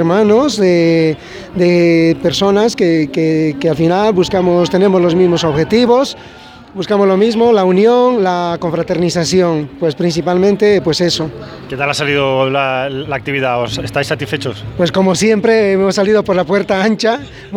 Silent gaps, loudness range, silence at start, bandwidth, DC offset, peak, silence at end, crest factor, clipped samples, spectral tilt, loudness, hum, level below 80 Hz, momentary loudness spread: none; 3 LU; 0 s; 15.5 kHz; under 0.1%; 0 dBFS; 0 s; 12 dB; under 0.1%; -5.5 dB/octave; -13 LUFS; none; -44 dBFS; 8 LU